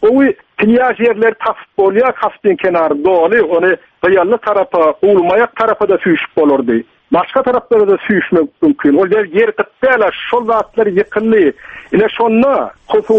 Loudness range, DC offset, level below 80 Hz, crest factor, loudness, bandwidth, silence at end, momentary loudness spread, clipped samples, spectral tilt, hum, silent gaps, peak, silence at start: 1 LU; under 0.1%; -50 dBFS; 12 dB; -12 LUFS; 5 kHz; 0 s; 5 LU; under 0.1%; -8 dB/octave; none; none; 0 dBFS; 0 s